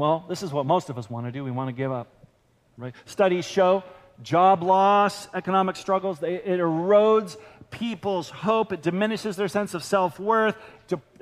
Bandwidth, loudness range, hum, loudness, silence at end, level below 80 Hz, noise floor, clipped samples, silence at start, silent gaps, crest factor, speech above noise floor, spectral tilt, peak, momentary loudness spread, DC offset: 15 kHz; 5 LU; none; -24 LUFS; 0.2 s; -66 dBFS; -63 dBFS; under 0.1%; 0 s; none; 16 dB; 39 dB; -6 dB/octave; -8 dBFS; 15 LU; under 0.1%